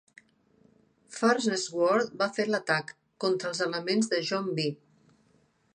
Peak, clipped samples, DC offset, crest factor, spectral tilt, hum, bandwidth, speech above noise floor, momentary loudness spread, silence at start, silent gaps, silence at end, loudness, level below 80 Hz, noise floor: -10 dBFS; under 0.1%; under 0.1%; 20 dB; -4 dB/octave; none; 10 kHz; 39 dB; 7 LU; 1.1 s; none; 1 s; -28 LUFS; -78 dBFS; -67 dBFS